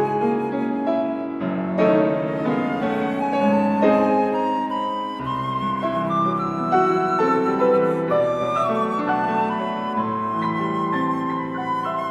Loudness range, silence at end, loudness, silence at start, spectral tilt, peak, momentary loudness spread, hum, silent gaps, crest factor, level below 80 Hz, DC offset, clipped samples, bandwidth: 2 LU; 0 s; -21 LUFS; 0 s; -7.5 dB/octave; -6 dBFS; 7 LU; none; none; 16 dB; -58 dBFS; under 0.1%; under 0.1%; 12 kHz